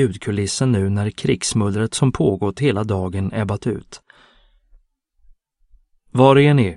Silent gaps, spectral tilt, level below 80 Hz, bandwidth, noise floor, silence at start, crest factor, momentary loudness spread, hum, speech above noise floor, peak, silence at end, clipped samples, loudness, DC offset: none; -6 dB/octave; -48 dBFS; 11.5 kHz; -59 dBFS; 0 s; 18 dB; 10 LU; none; 41 dB; 0 dBFS; 0 s; under 0.1%; -18 LUFS; under 0.1%